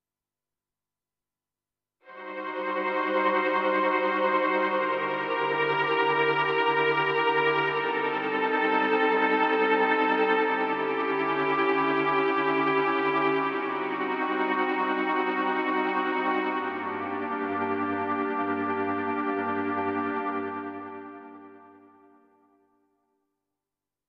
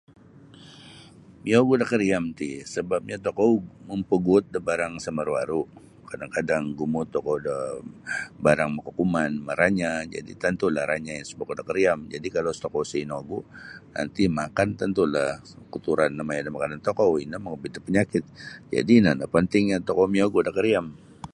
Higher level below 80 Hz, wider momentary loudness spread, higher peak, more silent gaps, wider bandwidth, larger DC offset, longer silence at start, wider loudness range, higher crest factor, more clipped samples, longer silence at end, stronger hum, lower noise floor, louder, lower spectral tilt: second, -82 dBFS vs -54 dBFS; second, 8 LU vs 14 LU; second, -12 dBFS vs -4 dBFS; neither; second, 6.4 kHz vs 11 kHz; neither; first, 2.05 s vs 0.6 s; about the same, 7 LU vs 5 LU; about the same, 16 dB vs 20 dB; neither; first, 2.4 s vs 0.05 s; first, 50 Hz at -80 dBFS vs none; first, under -90 dBFS vs -49 dBFS; about the same, -26 LUFS vs -25 LUFS; about the same, -6.5 dB/octave vs -6 dB/octave